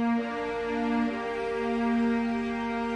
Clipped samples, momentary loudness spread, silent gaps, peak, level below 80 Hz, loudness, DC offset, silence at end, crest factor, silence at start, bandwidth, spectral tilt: under 0.1%; 5 LU; none; -18 dBFS; -54 dBFS; -29 LUFS; under 0.1%; 0 s; 10 dB; 0 s; 8.8 kHz; -6 dB/octave